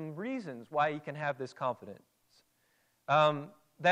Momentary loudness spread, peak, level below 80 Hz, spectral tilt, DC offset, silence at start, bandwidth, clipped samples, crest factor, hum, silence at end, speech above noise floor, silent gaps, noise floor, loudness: 19 LU; -14 dBFS; -84 dBFS; -6 dB/octave; under 0.1%; 0 s; 10 kHz; under 0.1%; 20 dB; none; 0 s; 41 dB; none; -73 dBFS; -33 LUFS